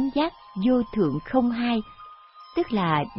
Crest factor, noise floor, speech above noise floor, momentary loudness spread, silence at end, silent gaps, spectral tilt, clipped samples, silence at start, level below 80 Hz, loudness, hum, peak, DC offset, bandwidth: 18 dB; -47 dBFS; 23 dB; 8 LU; 0 s; none; -11 dB/octave; under 0.1%; 0 s; -52 dBFS; -25 LUFS; none; -8 dBFS; under 0.1%; 5.8 kHz